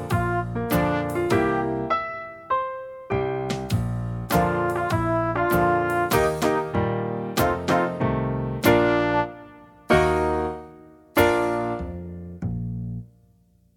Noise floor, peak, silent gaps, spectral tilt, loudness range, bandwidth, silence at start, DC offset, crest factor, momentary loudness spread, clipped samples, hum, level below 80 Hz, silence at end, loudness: -59 dBFS; -4 dBFS; none; -6 dB/octave; 3 LU; 18.5 kHz; 0 s; under 0.1%; 20 dB; 12 LU; under 0.1%; none; -42 dBFS; 0.7 s; -24 LUFS